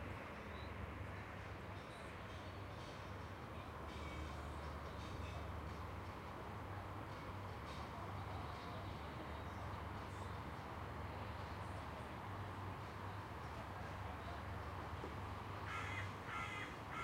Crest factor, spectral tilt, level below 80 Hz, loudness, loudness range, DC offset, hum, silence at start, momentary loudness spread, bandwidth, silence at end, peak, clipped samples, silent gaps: 14 dB; -6 dB/octave; -58 dBFS; -49 LUFS; 3 LU; under 0.1%; none; 0 s; 4 LU; 16 kHz; 0 s; -34 dBFS; under 0.1%; none